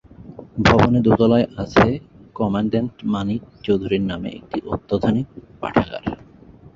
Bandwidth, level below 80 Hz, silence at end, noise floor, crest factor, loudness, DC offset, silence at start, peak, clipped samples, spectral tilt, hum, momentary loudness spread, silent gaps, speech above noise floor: 7.6 kHz; -40 dBFS; 0.6 s; -45 dBFS; 20 dB; -20 LUFS; under 0.1%; 0.2 s; 0 dBFS; under 0.1%; -7.5 dB/octave; none; 15 LU; none; 26 dB